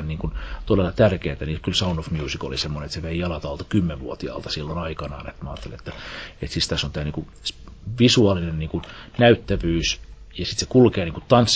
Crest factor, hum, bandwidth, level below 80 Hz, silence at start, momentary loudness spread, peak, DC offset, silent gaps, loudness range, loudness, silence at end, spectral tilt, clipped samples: 20 dB; none; 8 kHz; -36 dBFS; 0 s; 18 LU; -2 dBFS; under 0.1%; none; 8 LU; -23 LUFS; 0 s; -5.5 dB/octave; under 0.1%